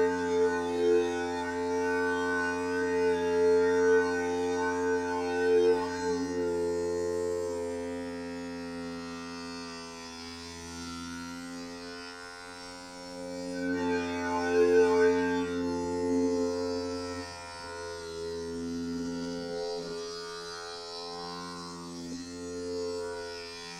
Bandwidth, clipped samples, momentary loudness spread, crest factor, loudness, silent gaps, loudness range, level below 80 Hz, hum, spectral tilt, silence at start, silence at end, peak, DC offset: 12.5 kHz; under 0.1%; 16 LU; 16 dB; -31 LUFS; none; 12 LU; -62 dBFS; none; -4.5 dB/octave; 0 s; 0 s; -14 dBFS; under 0.1%